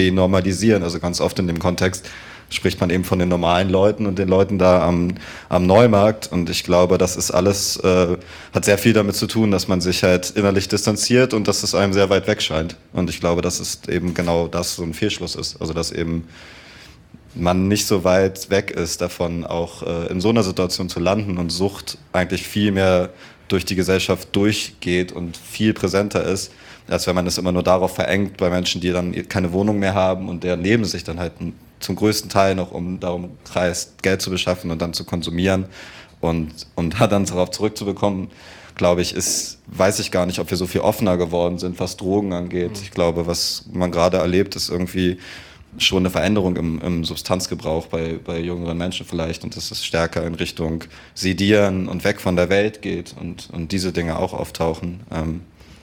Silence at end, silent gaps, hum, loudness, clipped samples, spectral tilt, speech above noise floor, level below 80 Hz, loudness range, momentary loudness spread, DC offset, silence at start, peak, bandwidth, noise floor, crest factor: 0.1 s; none; none; -20 LUFS; under 0.1%; -5 dB/octave; 25 dB; -46 dBFS; 6 LU; 10 LU; under 0.1%; 0 s; -2 dBFS; 18 kHz; -44 dBFS; 18 dB